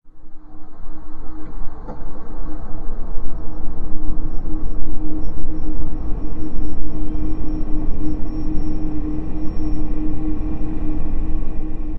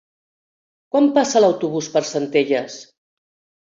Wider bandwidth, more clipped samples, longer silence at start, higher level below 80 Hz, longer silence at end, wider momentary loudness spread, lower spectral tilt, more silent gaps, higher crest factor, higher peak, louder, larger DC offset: second, 1.6 kHz vs 7.8 kHz; neither; second, 0.05 s vs 0.95 s; first, -22 dBFS vs -68 dBFS; second, 0 s vs 0.85 s; first, 11 LU vs 8 LU; first, -10.5 dB/octave vs -4.5 dB/octave; neither; second, 10 dB vs 16 dB; first, 0 dBFS vs -4 dBFS; second, -29 LUFS vs -18 LUFS; neither